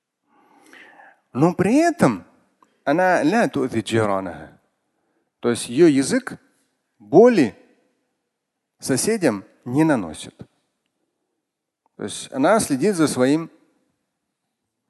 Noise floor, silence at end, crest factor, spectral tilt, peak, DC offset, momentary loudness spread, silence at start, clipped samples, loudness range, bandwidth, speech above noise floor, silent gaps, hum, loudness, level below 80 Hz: -80 dBFS; 1.45 s; 20 dB; -5.5 dB/octave; -2 dBFS; under 0.1%; 17 LU; 1.35 s; under 0.1%; 5 LU; 12.5 kHz; 62 dB; none; none; -19 LUFS; -58 dBFS